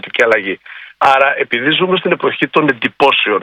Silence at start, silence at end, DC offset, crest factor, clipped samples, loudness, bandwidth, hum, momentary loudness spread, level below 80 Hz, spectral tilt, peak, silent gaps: 0.05 s; 0 s; under 0.1%; 14 dB; 0.2%; -13 LUFS; 12 kHz; none; 5 LU; -58 dBFS; -5 dB/octave; 0 dBFS; none